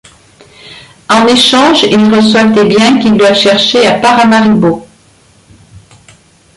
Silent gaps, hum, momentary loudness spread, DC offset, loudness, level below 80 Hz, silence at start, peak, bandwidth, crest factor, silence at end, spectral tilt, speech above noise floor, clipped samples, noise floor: none; none; 4 LU; under 0.1%; -6 LUFS; -46 dBFS; 0.65 s; 0 dBFS; 11.5 kHz; 8 dB; 1.7 s; -4.5 dB/octave; 38 dB; under 0.1%; -44 dBFS